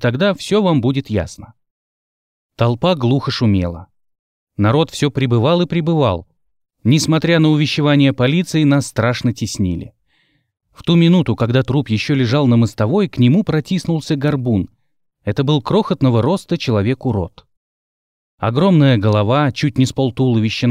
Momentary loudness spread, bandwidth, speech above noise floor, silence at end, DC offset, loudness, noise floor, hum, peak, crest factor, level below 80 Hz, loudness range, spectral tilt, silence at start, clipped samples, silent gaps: 8 LU; 14.5 kHz; 47 dB; 0 s; under 0.1%; -16 LUFS; -62 dBFS; none; -2 dBFS; 14 dB; -46 dBFS; 4 LU; -6.5 dB/octave; 0 s; under 0.1%; 1.71-2.50 s, 4.19-4.47 s, 17.57-18.38 s